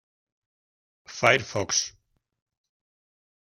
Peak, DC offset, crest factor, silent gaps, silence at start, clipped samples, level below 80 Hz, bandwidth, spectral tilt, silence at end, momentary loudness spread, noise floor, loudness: -4 dBFS; under 0.1%; 26 dB; none; 1.1 s; under 0.1%; -68 dBFS; 15.5 kHz; -2 dB/octave; 1.65 s; 14 LU; under -90 dBFS; -23 LUFS